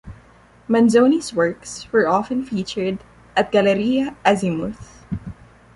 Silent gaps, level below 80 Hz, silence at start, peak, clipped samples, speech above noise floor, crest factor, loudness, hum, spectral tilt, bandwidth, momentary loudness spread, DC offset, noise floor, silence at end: none; -48 dBFS; 0.05 s; -2 dBFS; under 0.1%; 31 dB; 18 dB; -19 LUFS; none; -5.5 dB/octave; 11.5 kHz; 16 LU; under 0.1%; -50 dBFS; 0.45 s